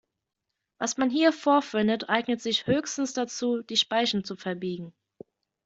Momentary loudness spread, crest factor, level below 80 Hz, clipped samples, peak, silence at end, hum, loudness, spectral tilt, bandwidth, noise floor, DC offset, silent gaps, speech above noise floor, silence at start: 10 LU; 18 dB; -66 dBFS; under 0.1%; -8 dBFS; 0.75 s; none; -26 LUFS; -3.5 dB/octave; 8 kHz; -84 dBFS; under 0.1%; none; 58 dB; 0.8 s